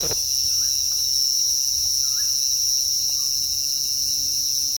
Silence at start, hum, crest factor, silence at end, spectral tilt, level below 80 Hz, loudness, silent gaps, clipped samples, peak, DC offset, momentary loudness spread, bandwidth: 0 s; none; 14 dB; 0 s; 1.5 dB/octave; -50 dBFS; -19 LUFS; none; under 0.1%; -8 dBFS; under 0.1%; 2 LU; over 20 kHz